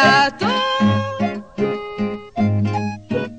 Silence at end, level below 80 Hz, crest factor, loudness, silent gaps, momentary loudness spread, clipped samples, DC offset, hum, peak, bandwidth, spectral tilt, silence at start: 0 s; -52 dBFS; 16 dB; -20 LUFS; none; 9 LU; under 0.1%; 0.3%; none; -2 dBFS; 8.8 kHz; -5.5 dB/octave; 0 s